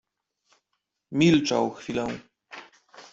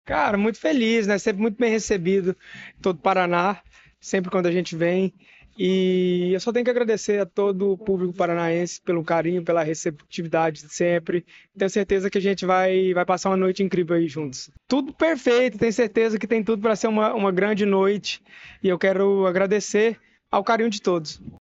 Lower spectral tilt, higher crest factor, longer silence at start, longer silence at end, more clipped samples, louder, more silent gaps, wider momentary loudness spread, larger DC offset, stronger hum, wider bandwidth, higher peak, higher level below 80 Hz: about the same, -5.5 dB/octave vs -5.5 dB/octave; about the same, 20 dB vs 16 dB; first, 1.1 s vs 0.05 s; second, 0.1 s vs 0.25 s; neither; about the same, -24 LUFS vs -22 LUFS; neither; first, 24 LU vs 7 LU; neither; neither; about the same, 7.8 kHz vs 8 kHz; about the same, -8 dBFS vs -6 dBFS; second, -62 dBFS vs -56 dBFS